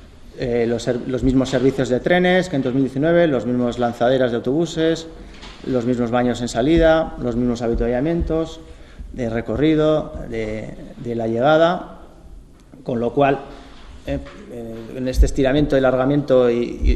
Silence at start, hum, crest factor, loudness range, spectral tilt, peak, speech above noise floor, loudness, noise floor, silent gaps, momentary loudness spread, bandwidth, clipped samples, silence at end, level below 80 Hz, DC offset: 0 s; none; 16 dB; 4 LU; -6.5 dB/octave; -2 dBFS; 24 dB; -19 LUFS; -42 dBFS; none; 16 LU; 12.5 kHz; under 0.1%; 0 s; -30 dBFS; under 0.1%